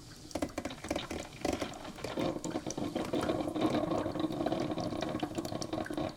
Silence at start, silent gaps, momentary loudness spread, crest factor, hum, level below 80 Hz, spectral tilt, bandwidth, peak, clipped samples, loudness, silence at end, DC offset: 0 s; none; 7 LU; 18 dB; none; -56 dBFS; -5 dB/octave; 18 kHz; -18 dBFS; under 0.1%; -36 LUFS; 0 s; under 0.1%